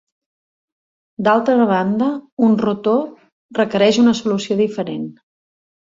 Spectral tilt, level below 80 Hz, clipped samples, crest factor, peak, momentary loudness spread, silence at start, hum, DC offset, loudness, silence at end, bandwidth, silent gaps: -6 dB/octave; -60 dBFS; under 0.1%; 16 dB; -2 dBFS; 11 LU; 1.2 s; none; under 0.1%; -17 LUFS; 0.75 s; 7.6 kHz; 2.32-2.37 s, 3.32-3.49 s